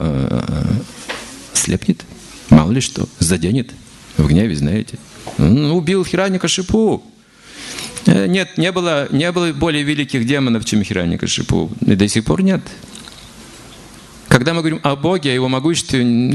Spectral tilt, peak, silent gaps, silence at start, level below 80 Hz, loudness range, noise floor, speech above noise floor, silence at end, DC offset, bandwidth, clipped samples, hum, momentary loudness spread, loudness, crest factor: -5 dB/octave; 0 dBFS; none; 0 s; -34 dBFS; 2 LU; -40 dBFS; 25 dB; 0 s; under 0.1%; 12.5 kHz; 0.2%; none; 17 LU; -16 LUFS; 16 dB